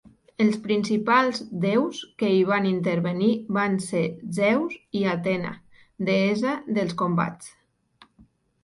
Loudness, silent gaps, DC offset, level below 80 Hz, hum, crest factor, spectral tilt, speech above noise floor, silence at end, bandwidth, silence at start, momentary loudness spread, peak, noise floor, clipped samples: -24 LUFS; none; under 0.1%; -64 dBFS; none; 18 dB; -6.5 dB/octave; 35 dB; 1.15 s; 11.5 kHz; 0.05 s; 9 LU; -6 dBFS; -58 dBFS; under 0.1%